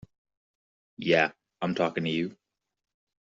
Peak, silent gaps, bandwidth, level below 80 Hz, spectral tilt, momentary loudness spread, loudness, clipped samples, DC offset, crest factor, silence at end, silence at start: -8 dBFS; none; 7.6 kHz; -70 dBFS; -3.5 dB/octave; 11 LU; -28 LUFS; under 0.1%; under 0.1%; 24 dB; 0.95 s; 1 s